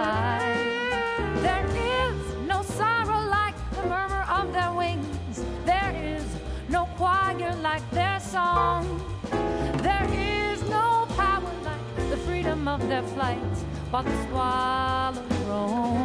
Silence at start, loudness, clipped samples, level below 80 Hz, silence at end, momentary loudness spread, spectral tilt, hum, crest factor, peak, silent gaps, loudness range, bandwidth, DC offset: 0 s; -26 LUFS; under 0.1%; -38 dBFS; 0 s; 8 LU; -5.5 dB/octave; none; 16 dB; -10 dBFS; none; 2 LU; 11 kHz; under 0.1%